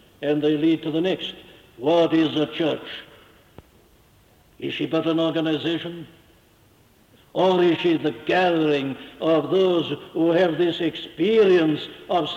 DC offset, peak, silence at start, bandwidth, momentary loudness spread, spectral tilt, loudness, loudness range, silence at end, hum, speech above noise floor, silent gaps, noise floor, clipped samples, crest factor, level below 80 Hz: under 0.1%; -8 dBFS; 0.2 s; 7.6 kHz; 12 LU; -7 dB/octave; -22 LUFS; 6 LU; 0 s; none; 35 dB; none; -56 dBFS; under 0.1%; 14 dB; -62 dBFS